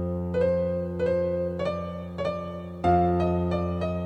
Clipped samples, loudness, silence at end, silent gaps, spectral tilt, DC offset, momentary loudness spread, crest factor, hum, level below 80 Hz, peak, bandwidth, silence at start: under 0.1%; -27 LUFS; 0 s; none; -9 dB/octave; under 0.1%; 9 LU; 16 dB; none; -46 dBFS; -10 dBFS; 8.2 kHz; 0 s